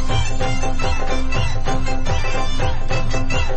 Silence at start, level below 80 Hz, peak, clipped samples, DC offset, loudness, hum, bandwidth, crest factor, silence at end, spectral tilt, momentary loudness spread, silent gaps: 0 s; -18 dBFS; -6 dBFS; under 0.1%; under 0.1%; -23 LUFS; none; 8.4 kHz; 8 dB; 0 s; -5 dB/octave; 2 LU; none